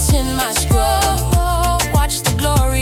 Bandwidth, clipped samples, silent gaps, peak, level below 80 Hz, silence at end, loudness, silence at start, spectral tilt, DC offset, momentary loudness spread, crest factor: 17 kHz; under 0.1%; none; -4 dBFS; -20 dBFS; 0 s; -16 LUFS; 0 s; -4 dB/octave; under 0.1%; 2 LU; 12 dB